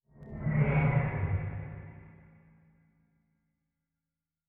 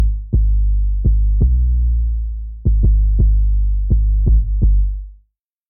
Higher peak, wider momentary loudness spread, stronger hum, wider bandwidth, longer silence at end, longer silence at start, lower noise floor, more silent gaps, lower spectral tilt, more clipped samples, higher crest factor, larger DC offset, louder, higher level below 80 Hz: second, -16 dBFS vs -6 dBFS; first, 21 LU vs 6 LU; neither; first, 3.5 kHz vs 0.7 kHz; first, 2.4 s vs 0.55 s; first, 0.2 s vs 0 s; first, -90 dBFS vs -60 dBFS; neither; second, -9 dB/octave vs -18.5 dB/octave; neither; first, 18 dB vs 8 dB; second, under 0.1% vs 0.3%; second, -31 LUFS vs -18 LUFS; second, -48 dBFS vs -14 dBFS